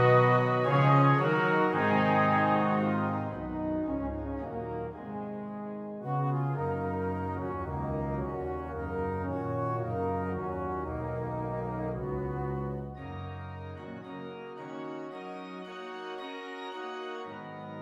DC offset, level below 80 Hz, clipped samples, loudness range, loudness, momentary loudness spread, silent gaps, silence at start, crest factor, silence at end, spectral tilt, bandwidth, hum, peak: under 0.1%; -50 dBFS; under 0.1%; 14 LU; -31 LUFS; 16 LU; none; 0 s; 20 dB; 0 s; -8.5 dB/octave; 7.2 kHz; none; -12 dBFS